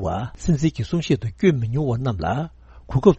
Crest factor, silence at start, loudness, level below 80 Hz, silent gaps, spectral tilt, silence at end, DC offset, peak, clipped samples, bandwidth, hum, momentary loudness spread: 20 dB; 0 s; -22 LUFS; -38 dBFS; none; -7.5 dB/octave; 0 s; under 0.1%; 0 dBFS; under 0.1%; 8.4 kHz; none; 7 LU